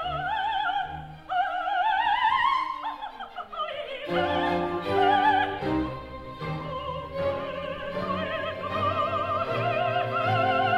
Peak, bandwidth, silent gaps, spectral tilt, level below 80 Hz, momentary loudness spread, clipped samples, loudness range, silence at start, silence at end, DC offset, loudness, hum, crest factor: -10 dBFS; 13 kHz; none; -6.5 dB/octave; -52 dBFS; 12 LU; under 0.1%; 4 LU; 0 s; 0 s; under 0.1%; -27 LUFS; none; 16 dB